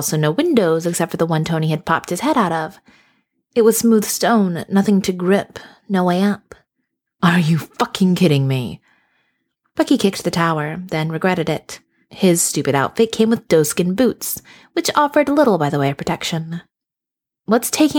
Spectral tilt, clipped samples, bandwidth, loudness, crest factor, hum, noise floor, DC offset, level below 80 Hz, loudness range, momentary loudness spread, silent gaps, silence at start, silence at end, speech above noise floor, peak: -5 dB/octave; under 0.1%; 19 kHz; -17 LUFS; 16 dB; none; -86 dBFS; under 0.1%; -56 dBFS; 3 LU; 10 LU; none; 0 s; 0 s; 69 dB; -2 dBFS